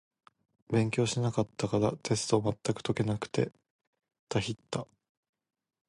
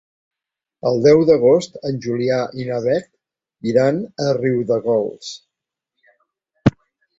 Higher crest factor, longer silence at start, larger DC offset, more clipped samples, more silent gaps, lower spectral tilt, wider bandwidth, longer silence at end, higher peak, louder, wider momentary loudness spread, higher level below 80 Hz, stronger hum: about the same, 20 dB vs 18 dB; second, 0.7 s vs 0.85 s; neither; neither; first, 3.70-3.79 s, 3.87-3.93 s, 4.19-4.27 s vs none; second, -5.5 dB/octave vs -7 dB/octave; first, 11.5 kHz vs 8 kHz; first, 1.05 s vs 0.5 s; second, -12 dBFS vs -2 dBFS; second, -32 LUFS vs -18 LUFS; second, 7 LU vs 13 LU; second, -60 dBFS vs -50 dBFS; neither